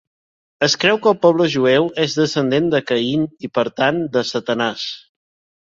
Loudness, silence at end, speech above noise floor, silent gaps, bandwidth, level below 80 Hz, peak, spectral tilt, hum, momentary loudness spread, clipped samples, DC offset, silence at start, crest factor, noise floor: -17 LUFS; 0.65 s; over 73 dB; none; 7.8 kHz; -58 dBFS; 0 dBFS; -4.5 dB/octave; none; 7 LU; under 0.1%; under 0.1%; 0.6 s; 18 dB; under -90 dBFS